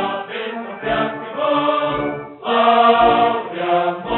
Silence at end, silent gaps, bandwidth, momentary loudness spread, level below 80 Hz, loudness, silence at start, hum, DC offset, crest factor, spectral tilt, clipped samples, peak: 0 s; none; 4.2 kHz; 14 LU; -48 dBFS; -18 LUFS; 0 s; none; under 0.1%; 16 dB; -2.5 dB/octave; under 0.1%; -2 dBFS